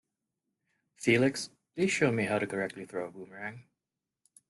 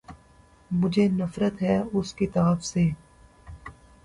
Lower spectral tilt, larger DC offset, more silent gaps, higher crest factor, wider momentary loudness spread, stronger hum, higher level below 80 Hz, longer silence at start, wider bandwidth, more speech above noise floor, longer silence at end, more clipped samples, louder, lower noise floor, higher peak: second, -5 dB/octave vs -7 dB/octave; neither; neither; about the same, 20 dB vs 16 dB; second, 16 LU vs 21 LU; neither; second, -72 dBFS vs -50 dBFS; first, 1 s vs 0.1 s; about the same, 12 kHz vs 11 kHz; first, 59 dB vs 32 dB; first, 0.9 s vs 0.35 s; neither; second, -30 LUFS vs -25 LUFS; first, -89 dBFS vs -56 dBFS; about the same, -12 dBFS vs -10 dBFS